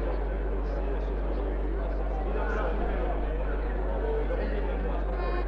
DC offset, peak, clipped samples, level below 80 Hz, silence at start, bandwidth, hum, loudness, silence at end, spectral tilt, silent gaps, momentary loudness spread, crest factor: under 0.1%; -18 dBFS; under 0.1%; -30 dBFS; 0 s; 4.9 kHz; none; -32 LUFS; 0 s; -9 dB/octave; none; 2 LU; 12 dB